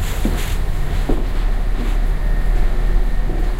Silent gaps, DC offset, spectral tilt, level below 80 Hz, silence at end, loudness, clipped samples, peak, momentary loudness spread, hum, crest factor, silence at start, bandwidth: none; under 0.1%; -6 dB/octave; -16 dBFS; 0 s; -23 LUFS; under 0.1%; -4 dBFS; 2 LU; none; 12 dB; 0 s; 15 kHz